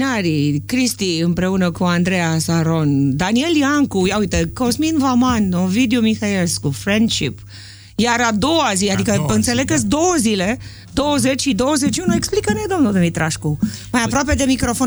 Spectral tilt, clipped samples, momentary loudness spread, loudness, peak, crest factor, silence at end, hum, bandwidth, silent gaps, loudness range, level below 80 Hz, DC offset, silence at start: -4.5 dB/octave; under 0.1%; 5 LU; -17 LUFS; -2 dBFS; 14 dB; 0 s; none; over 20 kHz; none; 1 LU; -38 dBFS; under 0.1%; 0 s